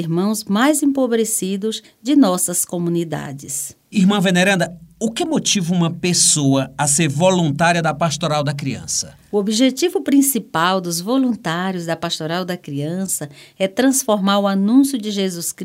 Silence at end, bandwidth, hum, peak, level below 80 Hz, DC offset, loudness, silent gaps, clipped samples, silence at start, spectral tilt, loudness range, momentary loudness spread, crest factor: 0 s; 16 kHz; none; -2 dBFS; -56 dBFS; under 0.1%; -18 LUFS; none; under 0.1%; 0 s; -4 dB/octave; 4 LU; 10 LU; 16 dB